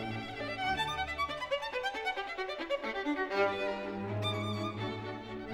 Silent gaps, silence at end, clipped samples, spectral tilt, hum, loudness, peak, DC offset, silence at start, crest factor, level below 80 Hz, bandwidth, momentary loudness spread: none; 0 s; under 0.1%; -5 dB/octave; none; -35 LUFS; -16 dBFS; under 0.1%; 0 s; 18 dB; -58 dBFS; 16 kHz; 7 LU